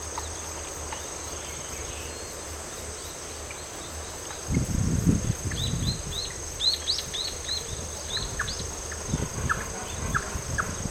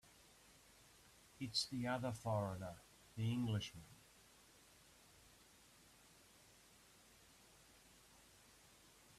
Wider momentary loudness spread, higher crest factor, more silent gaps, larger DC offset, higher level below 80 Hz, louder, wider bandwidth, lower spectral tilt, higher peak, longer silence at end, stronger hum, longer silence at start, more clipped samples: second, 10 LU vs 24 LU; about the same, 24 dB vs 22 dB; neither; neither; first, -40 dBFS vs -74 dBFS; first, -30 LUFS vs -44 LUFS; first, 17.5 kHz vs 14.5 kHz; second, -3 dB/octave vs -5 dB/octave; first, -8 dBFS vs -26 dBFS; about the same, 0 s vs 0.05 s; neither; about the same, 0 s vs 0.05 s; neither